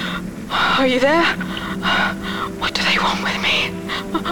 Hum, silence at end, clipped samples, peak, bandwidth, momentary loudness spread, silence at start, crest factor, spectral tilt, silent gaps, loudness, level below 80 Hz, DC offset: none; 0 s; under 0.1%; -6 dBFS; 19.5 kHz; 10 LU; 0 s; 14 dB; -4 dB/octave; none; -18 LUFS; -42 dBFS; 0.7%